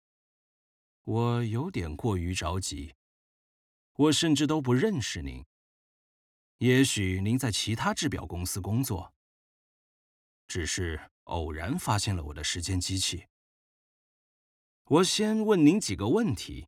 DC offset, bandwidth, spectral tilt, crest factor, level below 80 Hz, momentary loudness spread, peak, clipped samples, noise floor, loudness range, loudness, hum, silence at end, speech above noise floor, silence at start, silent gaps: under 0.1%; 17 kHz; -4.5 dB/octave; 20 dB; -52 dBFS; 14 LU; -10 dBFS; under 0.1%; under -90 dBFS; 6 LU; -28 LUFS; none; 0.05 s; over 62 dB; 1.05 s; 2.95-3.95 s, 5.46-6.59 s, 9.16-10.49 s, 11.11-11.26 s, 13.30-14.85 s